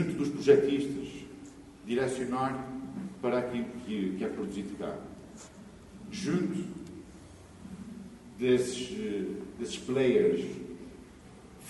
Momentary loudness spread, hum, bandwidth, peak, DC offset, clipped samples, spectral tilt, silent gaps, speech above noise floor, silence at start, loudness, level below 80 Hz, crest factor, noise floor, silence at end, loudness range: 23 LU; none; 11.5 kHz; -8 dBFS; under 0.1%; under 0.1%; -6 dB/octave; none; 21 dB; 0 s; -31 LUFS; -60 dBFS; 24 dB; -51 dBFS; 0 s; 7 LU